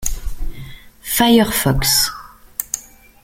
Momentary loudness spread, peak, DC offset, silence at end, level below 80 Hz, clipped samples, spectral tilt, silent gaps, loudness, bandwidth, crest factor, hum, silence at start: 21 LU; 0 dBFS; under 0.1%; 0.45 s; -30 dBFS; under 0.1%; -3.5 dB/octave; none; -16 LUFS; 17 kHz; 18 dB; none; 0 s